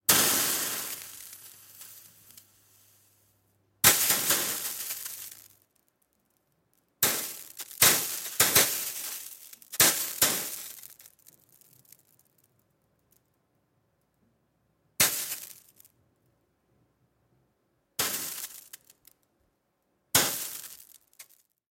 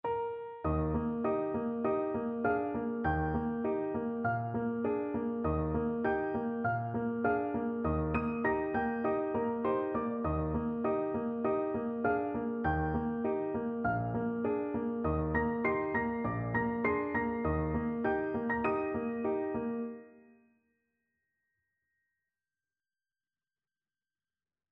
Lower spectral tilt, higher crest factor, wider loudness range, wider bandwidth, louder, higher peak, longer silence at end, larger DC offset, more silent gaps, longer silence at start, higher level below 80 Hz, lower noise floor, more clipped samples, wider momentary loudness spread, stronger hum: second, 0 dB/octave vs -8 dB/octave; first, 28 dB vs 16 dB; first, 13 LU vs 3 LU; first, 17 kHz vs 4 kHz; first, -25 LUFS vs -34 LUFS; first, -4 dBFS vs -18 dBFS; second, 0.5 s vs 4.5 s; neither; neither; about the same, 0.1 s vs 0.05 s; second, -66 dBFS vs -50 dBFS; second, -75 dBFS vs under -90 dBFS; neither; first, 24 LU vs 3 LU; neither